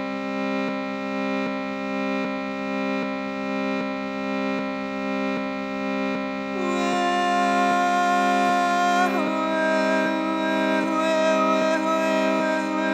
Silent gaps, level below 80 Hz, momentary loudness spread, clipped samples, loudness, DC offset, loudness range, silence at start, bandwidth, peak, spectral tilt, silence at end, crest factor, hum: none; -64 dBFS; 8 LU; under 0.1%; -23 LUFS; under 0.1%; 6 LU; 0 s; 14.5 kHz; -8 dBFS; -5 dB/octave; 0 s; 14 dB; 50 Hz at -35 dBFS